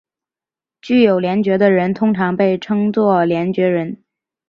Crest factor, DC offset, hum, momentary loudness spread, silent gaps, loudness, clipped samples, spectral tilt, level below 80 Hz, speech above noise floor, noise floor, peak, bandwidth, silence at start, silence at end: 14 dB; under 0.1%; none; 4 LU; none; -15 LUFS; under 0.1%; -8.5 dB/octave; -60 dBFS; 75 dB; -90 dBFS; -2 dBFS; 6.6 kHz; 0.85 s; 0.55 s